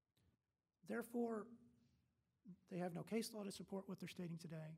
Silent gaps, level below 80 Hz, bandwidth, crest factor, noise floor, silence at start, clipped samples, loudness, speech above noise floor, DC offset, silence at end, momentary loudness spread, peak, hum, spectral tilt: none; -88 dBFS; 16 kHz; 20 dB; under -90 dBFS; 0.85 s; under 0.1%; -49 LUFS; over 41 dB; under 0.1%; 0 s; 20 LU; -32 dBFS; none; -5.5 dB/octave